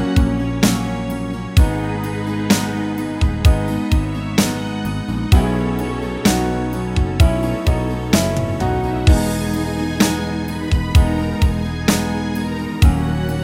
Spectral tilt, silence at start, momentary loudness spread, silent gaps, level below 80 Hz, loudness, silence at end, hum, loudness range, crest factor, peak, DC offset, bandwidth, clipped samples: -5.5 dB/octave; 0 s; 7 LU; none; -22 dBFS; -18 LUFS; 0 s; none; 1 LU; 16 dB; 0 dBFS; under 0.1%; 16.5 kHz; under 0.1%